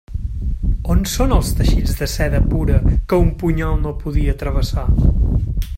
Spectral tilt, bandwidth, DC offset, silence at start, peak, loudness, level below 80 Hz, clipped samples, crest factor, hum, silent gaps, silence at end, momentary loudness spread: -6.5 dB/octave; 16.5 kHz; under 0.1%; 0.1 s; 0 dBFS; -19 LUFS; -18 dBFS; under 0.1%; 16 dB; none; none; 0 s; 6 LU